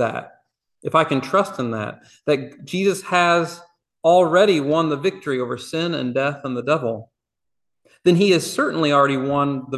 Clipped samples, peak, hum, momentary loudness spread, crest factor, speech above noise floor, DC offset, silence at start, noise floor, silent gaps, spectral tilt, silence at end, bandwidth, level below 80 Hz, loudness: under 0.1%; -2 dBFS; none; 12 LU; 18 dB; 64 dB; under 0.1%; 0 s; -83 dBFS; none; -5.5 dB/octave; 0 s; 12.5 kHz; -64 dBFS; -20 LUFS